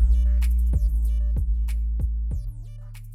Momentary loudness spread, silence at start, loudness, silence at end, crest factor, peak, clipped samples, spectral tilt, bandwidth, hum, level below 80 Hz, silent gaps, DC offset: 16 LU; 0 s; -25 LUFS; 0 s; 12 dB; -10 dBFS; under 0.1%; -7.5 dB/octave; 3 kHz; none; -22 dBFS; none; under 0.1%